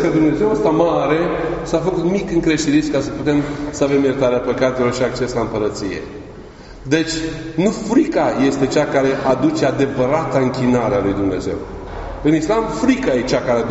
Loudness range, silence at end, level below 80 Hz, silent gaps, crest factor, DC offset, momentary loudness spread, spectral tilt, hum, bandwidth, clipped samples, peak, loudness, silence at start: 3 LU; 0 s; -38 dBFS; none; 16 dB; under 0.1%; 9 LU; -5.5 dB/octave; none; 8 kHz; under 0.1%; 0 dBFS; -17 LUFS; 0 s